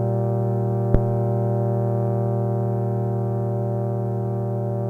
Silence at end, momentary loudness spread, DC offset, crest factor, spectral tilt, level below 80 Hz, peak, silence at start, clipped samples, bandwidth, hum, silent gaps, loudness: 0 s; 4 LU; under 0.1%; 22 dB; -12 dB/octave; -38 dBFS; 0 dBFS; 0 s; under 0.1%; 2 kHz; none; none; -23 LUFS